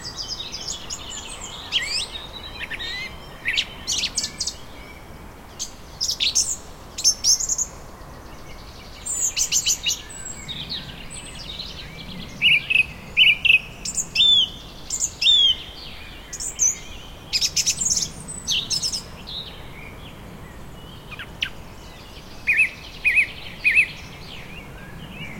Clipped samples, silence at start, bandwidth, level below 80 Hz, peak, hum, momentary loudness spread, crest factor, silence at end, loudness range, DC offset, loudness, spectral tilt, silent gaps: under 0.1%; 0 s; 16.5 kHz; -44 dBFS; -4 dBFS; none; 25 LU; 20 dB; 0 s; 10 LU; under 0.1%; -20 LUFS; 0.5 dB/octave; none